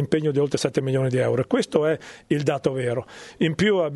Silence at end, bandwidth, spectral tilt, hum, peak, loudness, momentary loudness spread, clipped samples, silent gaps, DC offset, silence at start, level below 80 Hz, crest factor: 0 s; 11.5 kHz; -6 dB/octave; none; -4 dBFS; -23 LUFS; 6 LU; under 0.1%; none; under 0.1%; 0 s; -58 dBFS; 18 dB